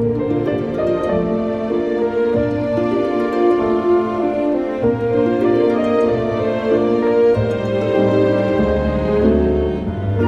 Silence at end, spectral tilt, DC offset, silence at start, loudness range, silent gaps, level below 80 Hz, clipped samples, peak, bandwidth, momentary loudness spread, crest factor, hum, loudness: 0 s; -9 dB/octave; under 0.1%; 0 s; 2 LU; none; -34 dBFS; under 0.1%; -2 dBFS; 8 kHz; 4 LU; 14 dB; none; -17 LUFS